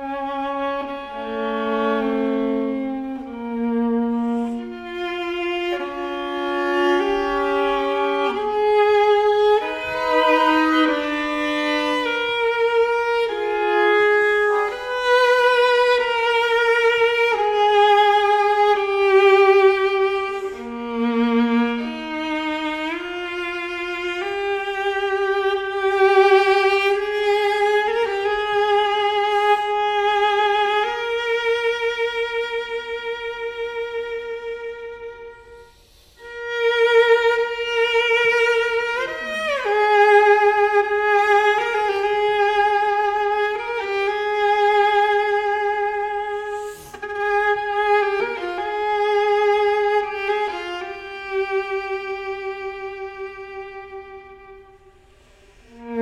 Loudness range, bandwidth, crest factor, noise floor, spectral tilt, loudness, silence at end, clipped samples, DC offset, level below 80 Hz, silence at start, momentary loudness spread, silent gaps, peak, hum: 9 LU; 12.5 kHz; 16 dB; -51 dBFS; -3.5 dB/octave; -19 LUFS; 0 s; under 0.1%; under 0.1%; -54 dBFS; 0 s; 13 LU; none; -4 dBFS; none